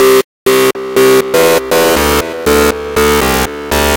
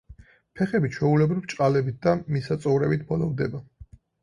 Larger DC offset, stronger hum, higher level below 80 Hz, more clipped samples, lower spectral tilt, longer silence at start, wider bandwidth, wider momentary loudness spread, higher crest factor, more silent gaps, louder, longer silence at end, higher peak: neither; neither; first, -26 dBFS vs -54 dBFS; neither; second, -3.5 dB/octave vs -8 dB/octave; about the same, 0 s vs 0.1 s; first, 17.5 kHz vs 11 kHz; second, 4 LU vs 7 LU; second, 10 dB vs 18 dB; first, 0.24-0.46 s vs none; first, -10 LUFS vs -24 LUFS; second, 0 s vs 0.4 s; first, 0 dBFS vs -8 dBFS